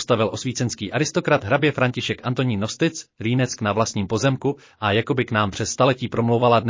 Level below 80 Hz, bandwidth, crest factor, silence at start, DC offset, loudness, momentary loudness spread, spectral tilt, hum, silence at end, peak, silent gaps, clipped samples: -50 dBFS; 7.6 kHz; 16 dB; 0 s; under 0.1%; -22 LUFS; 6 LU; -5 dB/octave; none; 0 s; -4 dBFS; none; under 0.1%